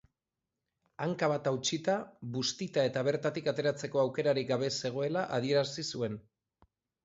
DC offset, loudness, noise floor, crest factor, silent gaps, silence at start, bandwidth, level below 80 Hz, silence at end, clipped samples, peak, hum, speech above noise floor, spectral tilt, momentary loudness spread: under 0.1%; -32 LUFS; -89 dBFS; 18 dB; none; 1 s; 8 kHz; -72 dBFS; 0.85 s; under 0.1%; -16 dBFS; none; 57 dB; -4.5 dB/octave; 6 LU